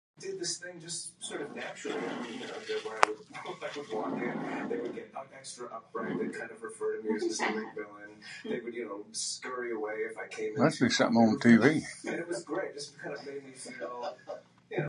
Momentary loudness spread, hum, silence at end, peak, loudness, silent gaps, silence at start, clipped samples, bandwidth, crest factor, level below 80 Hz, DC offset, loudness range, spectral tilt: 17 LU; none; 0 s; 0 dBFS; -32 LUFS; none; 0.2 s; under 0.1%; 11 kHz; 32 dB; -74 dBFS; under 0.1%; 9 LU; -4.5 dB/octave